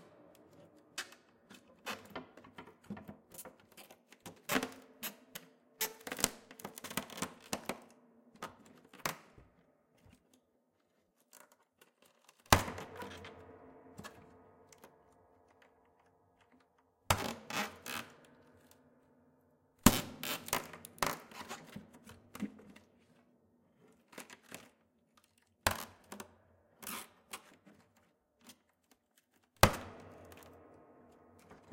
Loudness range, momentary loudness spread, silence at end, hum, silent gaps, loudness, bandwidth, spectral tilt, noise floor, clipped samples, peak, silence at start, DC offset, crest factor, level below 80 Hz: 16 LU; 29 LU; 0 s; none; none; -38 LUFS; 17 kHz; -3 dB/octave; -77 dBFS; under 0.1%; 0 dBFS; 0 s; under 0.1%; 42 dB; -56 dBFS